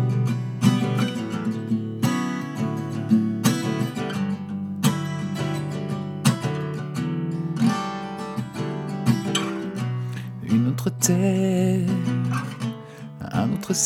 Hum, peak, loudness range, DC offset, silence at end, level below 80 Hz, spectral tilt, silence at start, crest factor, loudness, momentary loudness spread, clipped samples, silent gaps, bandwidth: none; -4 dBFS; 3 LU; under 0.1%; 0 s; -60 dBFS; -5.5 dB/octave; 0 s; 20 dB; -25 LUFS; 9 LU; under 0.1%; none; 17 kHz